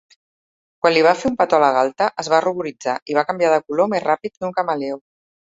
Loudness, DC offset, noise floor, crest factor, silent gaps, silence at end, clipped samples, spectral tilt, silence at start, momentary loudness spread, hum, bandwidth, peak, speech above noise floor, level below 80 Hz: -19 LUFS; under 0.1%; under -90 dBFS; 18 dB; 3.02-3.06 s; 0.6 s; under 0.1%; -4.5 dB/octave; 0.85 s; 10 LU; none; 8 kHz; -2 dBFS; over 72 dB; -60 dBFS